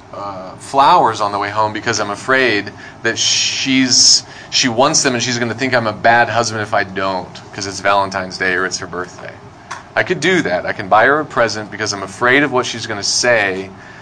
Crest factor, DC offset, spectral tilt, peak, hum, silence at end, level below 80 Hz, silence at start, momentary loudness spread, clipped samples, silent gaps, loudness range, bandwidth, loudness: 16 dB; under 0.1%; -2 dB/octave; 0 dBFS; none; 0 s; -52 dBFS; 0.1 s; 15 LU; under 0.1%; none; 6 LU; 10.5 kHz; -14 LUFS